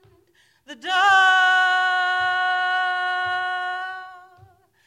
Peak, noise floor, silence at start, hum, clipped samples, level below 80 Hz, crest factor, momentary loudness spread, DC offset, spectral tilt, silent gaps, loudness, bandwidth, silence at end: -6 dBFS; -60 dBFS; 0.7 s; none; under 0.1%; -68 dBFS; 16 dB; 14 LU; under 0.1%; 0 dB/octave; none; -19 LUFS; 13 kHz; 0.65 s